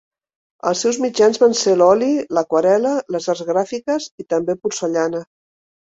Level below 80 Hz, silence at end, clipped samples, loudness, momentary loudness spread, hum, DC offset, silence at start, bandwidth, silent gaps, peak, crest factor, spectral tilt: -62 dBFS; 0.6 s; under 0.1%; -18 LUFS; 9 LU; none; under 0.1%; 0.65 s; 8 kHz; 4.11-4.18 s; -2 dBFS; 16 dB; -4 dB/octave